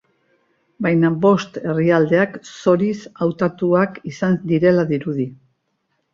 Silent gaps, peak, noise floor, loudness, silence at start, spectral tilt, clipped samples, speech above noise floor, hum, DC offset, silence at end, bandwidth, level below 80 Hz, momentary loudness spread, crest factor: none; -2 dBFS; -70 dBFS; -18 LUFS; 0.8 s; -7.5 dB/octave; under 0.1%; 52 dB; none; under 0.1%; 0.8 s; 7.4 kHz; -60 dBFS; 8 LU; 16 dB